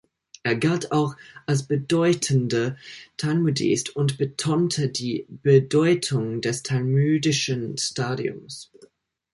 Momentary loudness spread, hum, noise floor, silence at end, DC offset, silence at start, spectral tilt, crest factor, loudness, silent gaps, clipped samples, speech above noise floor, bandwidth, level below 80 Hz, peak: 10 LU; none; -56 dBFS; 0.7 s; under 0.1%; 0.45 s; -5.5 dB/octave; 18 dB; -23 LUFS; none; under 0.1%; 33 dB; 11.5 kHz; -62 dBFS; -4 dBFS